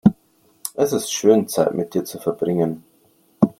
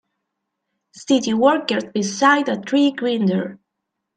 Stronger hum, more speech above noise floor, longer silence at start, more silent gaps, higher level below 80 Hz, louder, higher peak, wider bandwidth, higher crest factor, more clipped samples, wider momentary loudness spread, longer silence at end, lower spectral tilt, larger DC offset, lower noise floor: neither; second, 39 dB vs 61 dB; second, 0.05 s vs 0.95 s; neither; first, -56 dBFS vs -68 dBFS; second, -21 LUFS vs -18 LUFS; about the same, 0 dBFS vs -2 dBFS; first, 16.5 kHz vs 9.2 kHz; about the same, 20 dB vs 18 dB; neither; first, 12 LU vs 8 LU; second, 0.1 s vs 0.6 s; first, -6 dB/octave vs -4.5 dB/octave; neither; second, -59 dBFS vs -79 dBFS